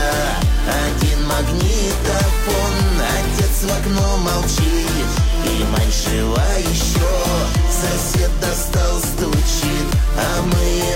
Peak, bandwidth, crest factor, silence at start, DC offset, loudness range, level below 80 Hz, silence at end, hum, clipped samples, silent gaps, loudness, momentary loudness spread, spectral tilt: -6 dBFS; 16.5 kHz; 10 dB; 0 s; under 0.1%; 0 LU; -20 dBFS; 0 s; none; under 0.1%; none; -18 LUFS; 1 LU; -4.5 dB/octave